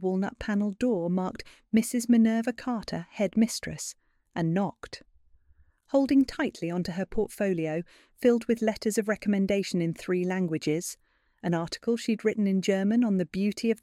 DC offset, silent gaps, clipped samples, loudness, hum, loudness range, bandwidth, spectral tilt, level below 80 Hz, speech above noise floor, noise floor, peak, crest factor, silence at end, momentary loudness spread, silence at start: under 0.1%; none; under 0.1%; -28 LUFS; none; 2 LU; 15 kHz; -6 dB/octave; -56 dBFS; 35 dB; -62 dBFS; -10 dBFS; 16 dB; 0.05 s; 11 LU; 0 s